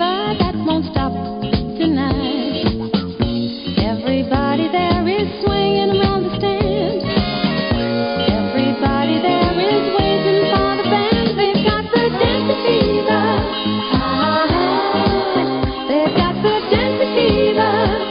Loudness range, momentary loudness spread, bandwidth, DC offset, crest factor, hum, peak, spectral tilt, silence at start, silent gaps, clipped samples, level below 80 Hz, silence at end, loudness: 3 LU; 4 LU; 5.4 kHz; under 0.1%; 16 dB; none; -2 dBFS; -11 dB/octave; 0 s; none; under 0.1%; -32 dBFS; 0 s; -17 LUFS